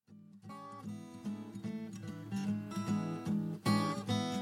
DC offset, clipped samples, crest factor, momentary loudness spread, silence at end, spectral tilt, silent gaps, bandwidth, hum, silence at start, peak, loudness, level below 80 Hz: under 0.1%; under 0.1%; 18 dB; 15 LU; 0 s; -6 dB/octave; none; 16 kHz; none; 0.1 s; -20 dBFS; -38 LUFS; -74 dBFS